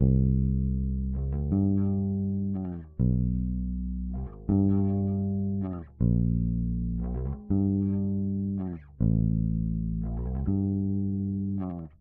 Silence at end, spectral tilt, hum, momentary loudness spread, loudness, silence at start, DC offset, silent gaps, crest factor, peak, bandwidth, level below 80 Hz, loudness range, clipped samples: 0.15 s; -15 dB/octave; none; 8 LU; -29 LUFS; 0 s; under 0.1%; none; 16 dB; -10 dBFS; 1.9 kHz; -34 dBFS; 1 LU; under 0.1%